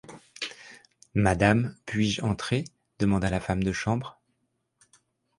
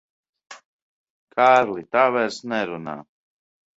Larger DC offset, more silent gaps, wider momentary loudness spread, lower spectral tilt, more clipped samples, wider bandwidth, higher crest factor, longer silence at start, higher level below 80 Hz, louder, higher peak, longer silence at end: neither; second, none vs 0.65-1.27 s; about the same, 15 LU vs 17 LU; first, -6 dB/octave vs -4.5 dB/octave; neither; first, 11.5 kHz vs 8 kHz; about the same, 24 dB vs 22 dB; second, 0.1 s vs 0.5 s; first, -46 dBFS vs -70 dBFS; second, -27 LUFS vs -20 LUFS; second, -6 dBFS vs -2 dBFS; first, 1.25 s vs 0.75 s